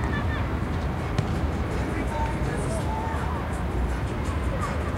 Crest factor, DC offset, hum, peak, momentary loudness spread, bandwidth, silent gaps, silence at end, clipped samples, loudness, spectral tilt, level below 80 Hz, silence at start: 16 dB; under 0.1%; none; -10 dBFS; 2 LU; 15 kHz; none; 0 s; under 0.1%; -28 LUFS; -6.5 dB/octave; -32 dBFS; 0 s